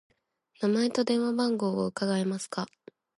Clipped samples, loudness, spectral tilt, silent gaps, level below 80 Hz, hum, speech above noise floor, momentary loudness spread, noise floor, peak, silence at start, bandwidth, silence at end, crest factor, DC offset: under 0.1%; -29 LUFS; -5.5 dB/octave; none; -74 dBFS; none; 40 dB; 8 LU; -68 dBFS; -14 dBFS; 0.6 s; 11.5 kHz; 0.5 s; 14 dB; under 0.1%